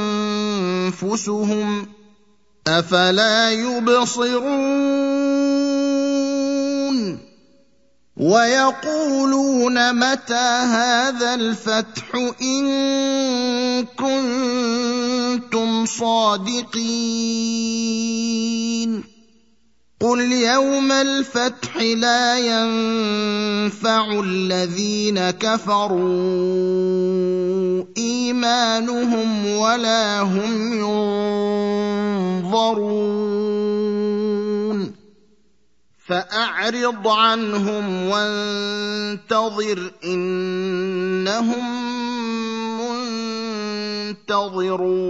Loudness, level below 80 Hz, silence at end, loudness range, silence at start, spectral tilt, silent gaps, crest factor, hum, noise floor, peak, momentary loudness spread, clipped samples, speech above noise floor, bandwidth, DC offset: -20 LUFS; -66 dBFS; 0 s; 5 LU; 0 s; -4 dB/octave; none; 20 dB; none; -65 dBFS; 0 dBFS; 8 LU; under 0.1%; 46 dB; 8 kHz; 0.1%